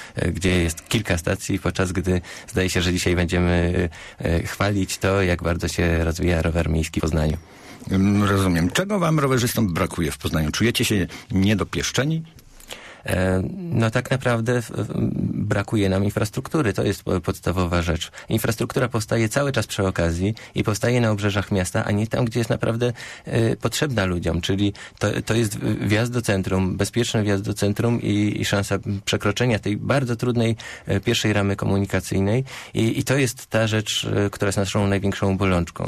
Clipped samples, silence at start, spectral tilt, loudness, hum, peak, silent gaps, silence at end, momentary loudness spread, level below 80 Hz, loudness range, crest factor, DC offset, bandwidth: under 0.1%; 0 s; -5.5 dB/octave; -22 LUFS; none; -8 dBFS; none; 0 s; 5 LU; -38 dBFS; 2 LU; 14 dB; under 0.1%; 14 kHz